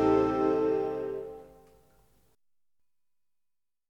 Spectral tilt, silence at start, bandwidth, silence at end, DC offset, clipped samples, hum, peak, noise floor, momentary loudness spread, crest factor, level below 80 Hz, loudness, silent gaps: -8 dB/octave; 0 s; 7.4 kHz; 2.45 s; under 0.1%; under 0.1%; none; -14 dBFS; -89 dBFS; 18 LU; 18 dB; -58 dBFS; -29 LUFS; none